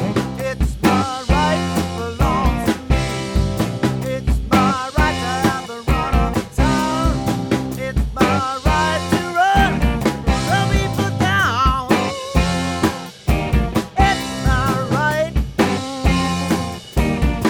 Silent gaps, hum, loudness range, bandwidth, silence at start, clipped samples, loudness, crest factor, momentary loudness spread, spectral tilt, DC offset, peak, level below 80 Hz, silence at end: none; none; 2 LU; 19 kHz; 0 s; under 0.1%; -19 LUFS; 16 dB; 5 LU; -5.5 dB/octave; under 0.1%; -2 dBFS; -24 dBFS; 0 s